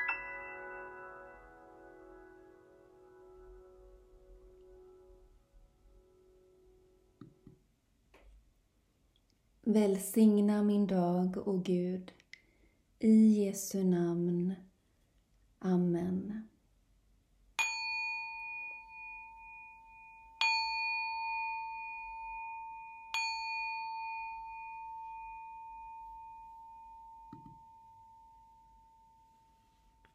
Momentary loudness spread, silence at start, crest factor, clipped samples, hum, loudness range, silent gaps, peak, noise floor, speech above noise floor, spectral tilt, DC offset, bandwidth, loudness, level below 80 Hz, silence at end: 24 LU; 0 s; 22 dB; under 0.1%; none; 20 LU; none; -16 dBFS; -73 dBFS; 43 dB; -5.5 dB/octave; under 0.1%; 15.5 kHz; -34 LUFS; -68 dBFS; 2.1 s